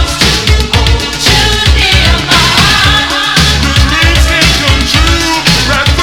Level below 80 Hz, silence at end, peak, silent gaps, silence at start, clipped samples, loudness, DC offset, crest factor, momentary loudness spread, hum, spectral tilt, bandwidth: -14 dBFS; 0 s; 0 dBFS; none; 0 s; 1%; -7 LUFS; 0.7%; 8 dB; 3 LU; none; -3 dB/octave; 18.5 kHz